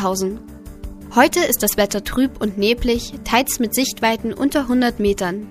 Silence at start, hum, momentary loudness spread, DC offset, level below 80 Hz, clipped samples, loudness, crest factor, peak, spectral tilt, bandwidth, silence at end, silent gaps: 0 s; none; 10 LU; under 0.1%; -36 dBFS; under 0.1%; -18 LUFS; 18 dB; 0 dBFS; -3.5 dB/octave; 15.5 kHz; 0 s; none